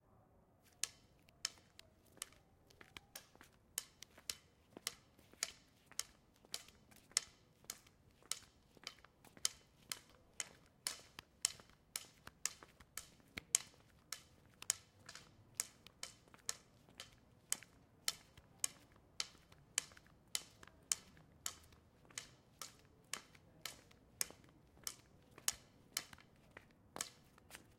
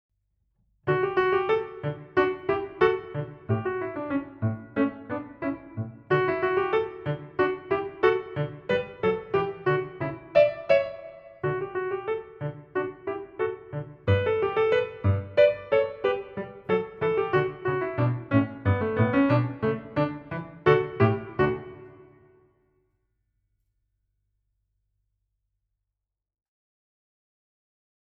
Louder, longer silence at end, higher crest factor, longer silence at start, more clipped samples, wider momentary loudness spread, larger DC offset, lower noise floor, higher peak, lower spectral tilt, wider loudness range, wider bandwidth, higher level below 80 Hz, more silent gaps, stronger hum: second, -46 LUFS vs -27 LUFS; second, 0.1 s vs 6 s; first, 44 dB vs 20 dB; second, 0.65 s vs 0.85 s; neither; first, 22 LU vs 13 LU; neither; second, -71 dBFS vs -86 dBFS; about the same, -6 dBFS vs -6 dBFS; second, 0.5 dB/octave vs -9 dB/octave; about the same, 6 LU vs 4 LU; first, 16.5 kHz vs 6.2 kHz; second, -76 dBFS vs -58 dBFS; neither; neither